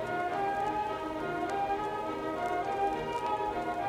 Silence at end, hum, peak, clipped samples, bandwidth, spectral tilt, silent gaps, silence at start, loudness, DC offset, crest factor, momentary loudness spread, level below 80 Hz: 0 s; none; -20 dBFS; under 0.1%; 16 kHz; -5.5 dB/octave; none; 0 s; -33 LUFS; under 0.1%; 12 dB; 3 LU; -58 dBFS